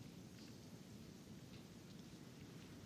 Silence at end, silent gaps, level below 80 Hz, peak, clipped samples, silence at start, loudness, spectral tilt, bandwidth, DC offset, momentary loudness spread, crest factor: 0 s; none; -74 dBFS; -44 dBFS; under 0.1%; 0 s; -58 LUFS; -5 dB/octave; 16 kHz; under 0.1%; 1 LU; 12 dB